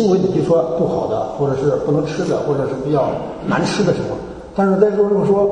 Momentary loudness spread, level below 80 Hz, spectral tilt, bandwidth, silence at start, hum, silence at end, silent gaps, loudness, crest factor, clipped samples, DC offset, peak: 7 LU; -44 dBFS; -7 dB/octave; 9.6 kHz; 0 s; none; 0 s; none; -17 LUFS; 16 dB; under 0.1%; under 0.1%; 0 dBFS